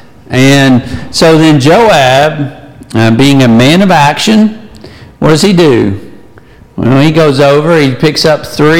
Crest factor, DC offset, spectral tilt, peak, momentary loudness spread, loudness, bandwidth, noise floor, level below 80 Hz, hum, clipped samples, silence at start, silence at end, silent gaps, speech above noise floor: 6 dB; under 0.1%; -5.5 dB/octave; 0 dBFS; 10 LU; -6 LUFS; 17 kHz; -36 dBFS; -36 dBFS; none; 0.3%; 0 s; 0 s; none; 30 dB